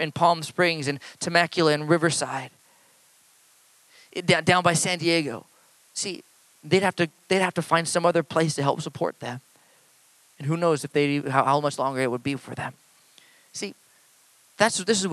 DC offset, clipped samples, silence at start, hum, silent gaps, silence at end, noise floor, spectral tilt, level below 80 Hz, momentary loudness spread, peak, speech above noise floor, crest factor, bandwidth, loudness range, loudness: under 0.1%; under 0.1%; 0 s; none; none; 0 s; -59 dBFS; -4 dB/octave; -68 dBFS; 14 LU; -2 dBFS; 35 dB; 22 dB; 13.5 kHz; 3 LU; -24 LUFS